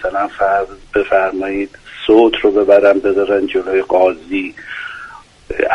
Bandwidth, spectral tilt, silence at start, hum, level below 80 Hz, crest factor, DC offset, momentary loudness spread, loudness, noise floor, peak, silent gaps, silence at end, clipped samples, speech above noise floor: 9.8 kHz; -5.5 dB/octave; 0 s; none; -44 dBFS; 14 dB; under 0.1%; 16 LU; -14 LUFS; -36 dBFS; 0 dBFS; none; 0 s; under 0.1%; 22 dB